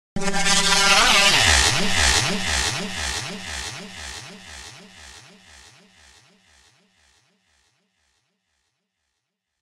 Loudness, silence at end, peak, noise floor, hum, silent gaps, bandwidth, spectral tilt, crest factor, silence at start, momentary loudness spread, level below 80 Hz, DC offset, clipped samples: -17 LUFS; 4.4 s; -2 dBFS; -79 dBFS; none; none; 14 kHz; -1.5 dB/octave; 22 dB; 0.15 s; 24 LU; -36 dBFS; under 0.1%; under 0.1%